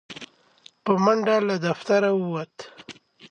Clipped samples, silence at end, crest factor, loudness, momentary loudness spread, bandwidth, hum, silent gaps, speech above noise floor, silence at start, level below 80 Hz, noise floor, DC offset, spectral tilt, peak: under 0.1%; 0.05 s; 18 dB; -23 LUFS; 22 LU; 9.4 kHz; none; none; 32 dB; 0.1 s; -74 dBFS; -55 dBFS; under 0.1%; -6 dB/octave; -8 dBFS